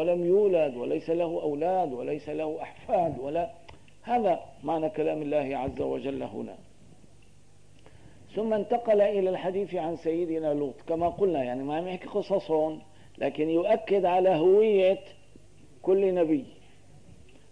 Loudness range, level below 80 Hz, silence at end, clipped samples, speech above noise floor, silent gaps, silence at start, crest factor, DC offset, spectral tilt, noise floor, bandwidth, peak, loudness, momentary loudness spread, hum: 7 LU; -60 dBFS; 1 s; under 0.1%; 32 dB; none; 0 s; 14 dB; 0.3%; -7.5 dB/octave; -58 dBFS; 10 kHz; -14 dBFS; -27 LUFS; 10 LU; none